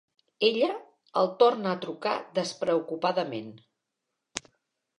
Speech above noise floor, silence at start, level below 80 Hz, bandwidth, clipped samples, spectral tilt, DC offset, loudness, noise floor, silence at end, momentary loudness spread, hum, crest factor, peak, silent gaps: 57 dB; 0.4 s; -76 dBFS; 11 kHz; under 0.1%; -4.5 dB/octave; under 0.1%; -27 LUFS; -84 dBFS; 0.6 s; 16 LU; none; 22 dB; -6 dBFS; none